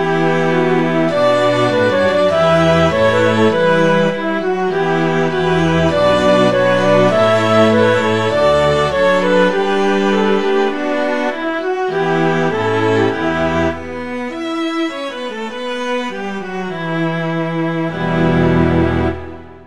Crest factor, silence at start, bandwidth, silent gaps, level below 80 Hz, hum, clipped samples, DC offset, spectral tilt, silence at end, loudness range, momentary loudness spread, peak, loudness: 14 dB; 0 s; 11.5 kHz; none; -40 dBFS; none; under 0.1%; 2%; -6.5 dB/octave; 0 s; 8 LU; 10 LU; 0 dBFS; -15 LUFS